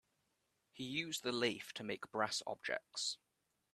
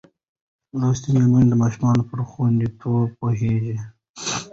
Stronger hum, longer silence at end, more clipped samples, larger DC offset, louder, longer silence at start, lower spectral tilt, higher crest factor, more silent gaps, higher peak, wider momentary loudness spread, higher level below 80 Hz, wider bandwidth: neither; first, 0.6 s vs 0 s; neither; neither; second, -41 LUFS vs -21 LUFS; about the same, 0.75 s vs 0.75 s; second, -2.5 dB/octave vs -7 dB/octave; first, 24 dB vs 14 dB; second, none vs 4.09-4.14 s; second, -20 dBFS vs -6 dBFS; second, 7 LU vs 13 LU; second, -84 dBFS vs -48 dBFS; first, 14 kHz vs 8 kHz